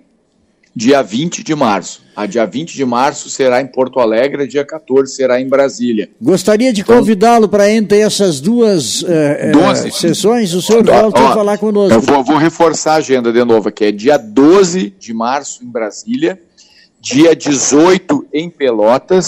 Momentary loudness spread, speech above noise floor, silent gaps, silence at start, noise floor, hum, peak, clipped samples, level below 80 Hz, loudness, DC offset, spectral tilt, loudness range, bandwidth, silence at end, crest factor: 10 LU; 45 dB; none; 0.75 s; -56 dBFS; none; 0 dBFS; under 0.1%; -48 dBFS; -11 LUFS; under 0.1%; -4.5 dB/octave; 4 LU; 16 kHz; 0 s; 12 dB